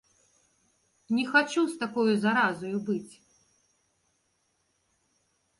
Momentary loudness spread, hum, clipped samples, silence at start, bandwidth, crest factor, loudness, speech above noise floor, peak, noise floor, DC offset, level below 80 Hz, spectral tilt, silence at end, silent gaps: 9 LU; none; under 0.1%; 1.1 s; 11.5 kHz; 22 dB; -27 LUFS; 47 dB; -10 dBFS; -74 dBFS; under 0.1%; -74 dBFS; -5 dB/octave; 2.5 s; none